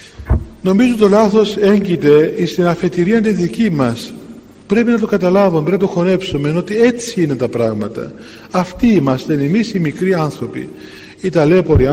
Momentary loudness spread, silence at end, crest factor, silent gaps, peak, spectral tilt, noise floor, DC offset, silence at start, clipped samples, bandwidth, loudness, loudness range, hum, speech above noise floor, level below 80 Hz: 13 LU; 0 s; 14 dB; none; 0 dBFS; -7 dB/octave; -36 dBFS; under 0.1%; 0 s; under 0.1%; 15.5 kHz; -14 LUFS; 4 LU; none; 23 dB; -34 dBFS